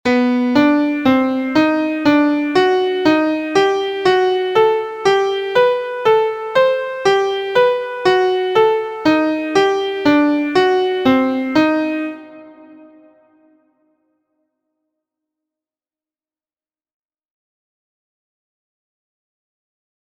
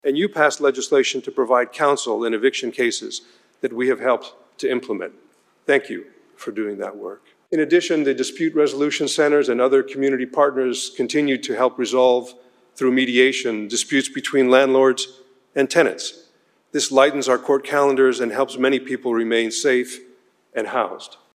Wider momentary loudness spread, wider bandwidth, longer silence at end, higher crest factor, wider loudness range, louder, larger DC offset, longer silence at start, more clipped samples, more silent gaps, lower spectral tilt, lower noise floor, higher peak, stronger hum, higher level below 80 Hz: second, 3 LU vs 13 LU; second, 9.2 kHz vs 14 kHz; first, 7.3 s vs 0.25 s; about the same, 16 dB vs 20 dB; about the same, 5 LU vs 5 LU; first, -15 LUFS vs -19 LUFS; neither; about the same, 0.05 s vs 0.05 s; neither; neither; first, -5 dB/octave vs -3 dB/octave; first, under -90 dBFS vs -59 dBFS; about the same, 0 dBFS vs 0 dBFS; neither; first, -58 dBFS vs -76 dBFS